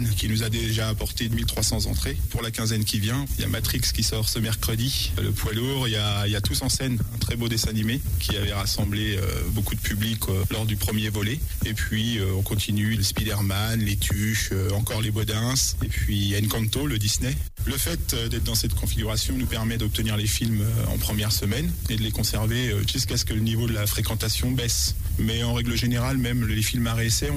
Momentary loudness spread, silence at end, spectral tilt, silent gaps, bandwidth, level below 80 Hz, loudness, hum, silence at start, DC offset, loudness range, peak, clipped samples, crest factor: 3 LU; 0 s; -4 dB/octave; none; 16 kHz; -32 dBFS; -25 LUFS; none; 0 s; under 0.1%; 1 LU; -10 dBFS; under 0.1%; 14 dB